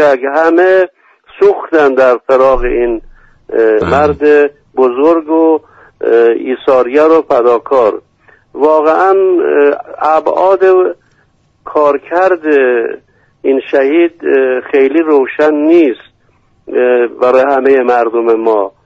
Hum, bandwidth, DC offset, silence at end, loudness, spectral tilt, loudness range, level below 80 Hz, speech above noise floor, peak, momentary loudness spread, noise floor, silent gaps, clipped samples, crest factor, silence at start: none; 7.6 kHz; under 0.1%; 0.15 s; -10 LUFS; -7 dB/octave; 1 LU; -36 dBFS; 44 dB; 0 dBFS; 7 LU; -52 dBFS; none; under 0.1%; 10 dB; 0 s